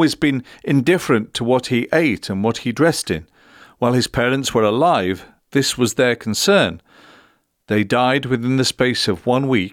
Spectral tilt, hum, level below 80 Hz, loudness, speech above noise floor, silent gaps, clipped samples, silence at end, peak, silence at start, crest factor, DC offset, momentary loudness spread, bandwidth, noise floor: -4.5 dB/octave; none; -50 dBFS; -18 LUFS; 38 dB; none; under 0.1%; 0.05 s; -4 dBFS; 0 s; 14 dB; under 0.1%; 6 LU; 17 kHz; -56 dBFS